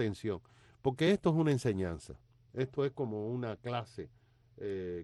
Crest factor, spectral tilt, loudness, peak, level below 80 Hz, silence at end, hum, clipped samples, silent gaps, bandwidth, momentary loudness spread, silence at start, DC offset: 18 dB; -7 dB/octave; -35 LUFS; -18 dBFS; -62 dBFS; 0 s; none; under 0.1%; none; 12 kHz; 18 LU; 0 s; under 0.1%